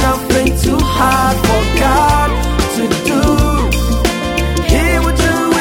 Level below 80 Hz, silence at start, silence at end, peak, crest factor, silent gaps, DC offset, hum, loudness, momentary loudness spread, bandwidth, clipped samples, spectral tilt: -18 dBFS; 0 s; 0 s; 0 dBFS; 12 dB; none; under 0.1%; none; -13 LUFS; 4 LU; 19 kHz; under 0.1%; -5 dB/octave